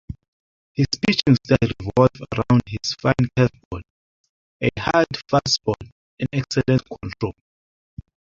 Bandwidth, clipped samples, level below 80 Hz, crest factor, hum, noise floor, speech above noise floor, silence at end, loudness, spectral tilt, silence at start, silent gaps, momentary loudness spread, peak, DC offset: 7.6 kHz; under 0.1%; -44 dBFS; 20 dB; none; under -90 dBFS; over 70 dB; 1.05 s; -21 LUFS; -6 dB/octave; 0.1 s; 0.28-0.75 s, 3.65-3.71 s, 3.90-4.60 s, 5.92-6.17 s; 13 LU; -2 dBFS; under 0.1%